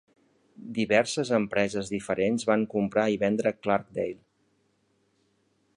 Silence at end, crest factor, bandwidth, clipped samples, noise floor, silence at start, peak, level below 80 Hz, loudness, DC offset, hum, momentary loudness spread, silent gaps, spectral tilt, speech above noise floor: 1.6 s; 22 dB; 11 kHz; under 0.1%; -70 dBFS; 0.6 s; -8 dBFS; -64 dBFS; -27 LUFS; under 0.1%; none; 9 LU; none; -5 dB/octave; 44 dB